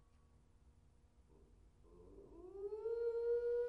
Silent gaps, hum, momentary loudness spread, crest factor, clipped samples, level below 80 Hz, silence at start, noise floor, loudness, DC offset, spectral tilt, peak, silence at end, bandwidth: none; none; 22 LU; 14 dB; under 0.1%; -68 dBFS; 0.65 s; -70 dBFS; -42 LUFS; under 0.1%; -7.5 dB/octave; -32 dBFS; 0 s; 4.6 kHz